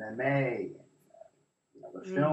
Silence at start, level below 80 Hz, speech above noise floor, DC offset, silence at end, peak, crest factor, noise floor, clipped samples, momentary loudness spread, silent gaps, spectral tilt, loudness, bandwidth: 0 s; -76 dBFS; 37 dB; under 0.1%; 0 s; -16 dBFS; 18 dB; -68 dBFS; under 0.1%; 23 LU; none; -8.5 dB/octave; -32 LUFS; 8.2 kHz